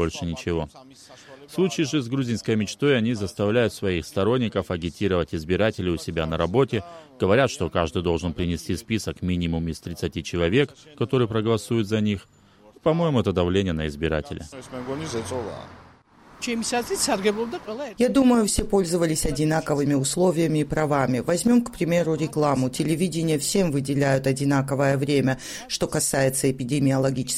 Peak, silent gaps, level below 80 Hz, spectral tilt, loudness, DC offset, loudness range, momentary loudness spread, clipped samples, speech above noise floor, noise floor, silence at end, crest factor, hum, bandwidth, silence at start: -6 dBFS; none; -44 dBFS; -5.5 dB/octave; -24 LUFS; under 0.1%; 4 LU; 9 LU; under 0.1%; 28 dB; -52 dBFS; 0 s; 16 dB; none; 16 kHz; 0 s